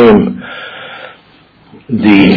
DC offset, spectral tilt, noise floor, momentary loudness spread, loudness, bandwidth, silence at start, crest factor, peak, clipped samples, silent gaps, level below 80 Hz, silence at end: under 0.1%; -9 dB/octave; -44 dBFS; 22 LU; -10 LUFS; 5.4 kHz; 0 s; 10 dB; 0 dBFS; 1%; none; -40 dBFS; 0 s